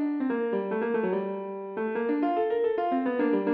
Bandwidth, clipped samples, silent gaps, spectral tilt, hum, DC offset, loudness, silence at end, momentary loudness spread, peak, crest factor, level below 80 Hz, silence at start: 4.9 kHz; under 0.1%; none; -6 dB/octave; none; under 0.1%; -28 LUFS; 0 s; 6 LU; -16 dBFS; 12 dB; -74 dBFS; 0 s